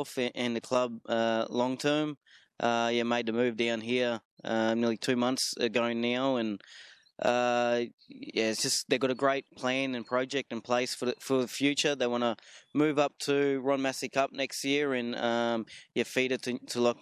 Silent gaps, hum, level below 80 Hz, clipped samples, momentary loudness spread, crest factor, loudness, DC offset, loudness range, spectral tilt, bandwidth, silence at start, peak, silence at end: 2.17-2.21 s, 4.25-4.37 s, 7.94-7.98 s; none; -78 dBFS; under 0.1%; 7 LU; 18 dB; -30 LUFS; under 0.1%; 1 LU; -3.5 dB/octave; 14.5 kHz; 0 s; -12 dBFS; 0.1 s